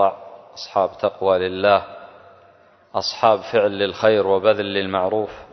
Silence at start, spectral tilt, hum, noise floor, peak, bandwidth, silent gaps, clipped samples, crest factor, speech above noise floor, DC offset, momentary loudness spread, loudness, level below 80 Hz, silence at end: 0 s; -5 dB/octave; none; -52 dBFS; -2 dBFS; 6.4 kHz; none; under 0.1%; 18 dB; 33 dB; under 0.1%; 15 LU; -20 LUFS; -54 dBFS; 0.1 s